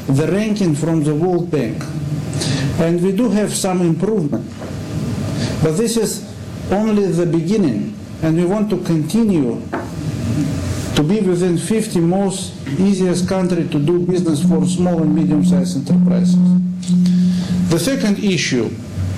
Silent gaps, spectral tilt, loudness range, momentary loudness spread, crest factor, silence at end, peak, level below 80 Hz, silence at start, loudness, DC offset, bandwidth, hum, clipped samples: none; -6.5 dB/octave; 4 LU; 9 LU; 10 dB; 0 s; -6 dBFS; -42 dBFS; 0 s; -17 LUFS; under 0.1%; 14.5 kHz; none; under 0.1%